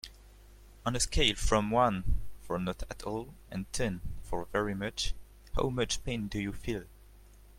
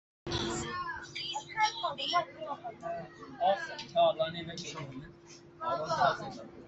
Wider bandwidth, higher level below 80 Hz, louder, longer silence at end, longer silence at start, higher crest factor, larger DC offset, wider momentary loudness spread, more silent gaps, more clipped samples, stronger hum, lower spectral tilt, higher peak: first, 16 kHz vs 8.4 kHz; first, -40 dBFS vs -60 dBFS; about the same, -33 LUFS vs -34 LUFS; first, 0.25 s vs 0 s; second, 0.05 s vs 0.25 s; about the same, 22 dB vs 20 dB; neither; about the same, 13 LU vs 15 LU; neither; neither; neither; about the same, -4 dB/octave vs -3.5 dB/octave; about the same, -12 dBFS vs -14 dBFS